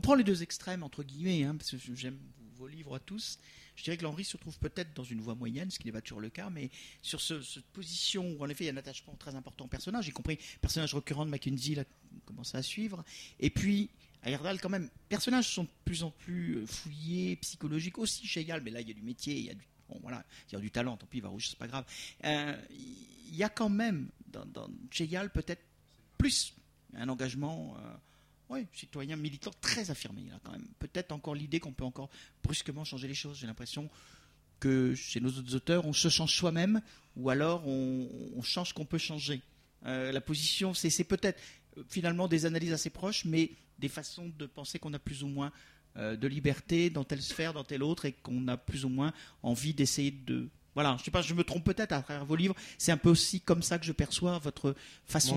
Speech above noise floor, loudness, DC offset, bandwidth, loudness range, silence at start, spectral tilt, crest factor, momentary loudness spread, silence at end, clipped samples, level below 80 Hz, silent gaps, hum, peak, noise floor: 30 dB; -35 LUFS; under 0.1%; 15.5 kHz; 9 LU; 0.05 s; -4.5 dB/octave; 24 dB; 15 LU; 0 s; under 0.1%; -54 dBFS; none; none; -12 dBFS; -65 dBFS